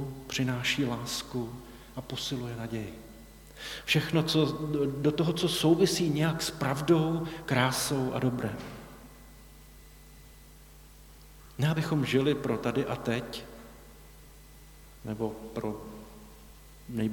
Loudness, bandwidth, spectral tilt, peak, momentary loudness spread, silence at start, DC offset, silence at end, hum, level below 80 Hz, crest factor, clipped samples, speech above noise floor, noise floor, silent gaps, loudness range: -30 LUFS; 19 kHz; -5 dB/octave; -10 dBFS; 22 LU; 0 s; under 0.1%; 0 s; none; -54 dBFS; 22 dB; under 0.1%; 23 dB; -52 dBFS; none; 12 LU